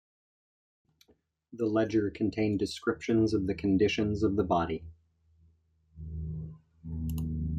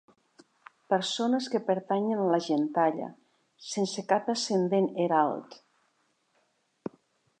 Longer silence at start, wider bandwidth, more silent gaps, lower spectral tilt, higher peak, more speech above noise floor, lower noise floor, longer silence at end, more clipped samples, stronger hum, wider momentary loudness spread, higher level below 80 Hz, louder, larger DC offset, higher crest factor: first, 1.5 s vs 0.9 s; first, 15 kHz vs 10 kHz; neither; first, -7 dB/octave vs -5 dB/octave; second, -14 dBFS vs -10 dBFS; second, 41 dB vs 45 dB; second, -69 dBFS vs -73 dBFS; second, 0 s vs 1.85 s; neither; neither; about the same, 15 LU vs 16 LU; first, -50 dBFS vs -84 dBFS; about the same, -30 LUFS vs -28 LUFS; neither; about the same, 16 dB vs 20 dB